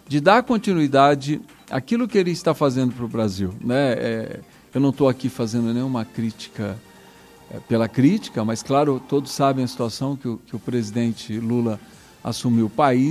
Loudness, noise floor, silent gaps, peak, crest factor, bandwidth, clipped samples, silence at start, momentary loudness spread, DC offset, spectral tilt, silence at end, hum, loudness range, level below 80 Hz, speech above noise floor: -22 LUFS; -47 dBFS; none; -2 dBFS; 20 dB; 14.5 kHz; under 0.1%; 0.1 s; 12 LU; under 0.1%; -6.5 dB/octave; 0 s; none; 4 LU; -54 dBFS; 26 dB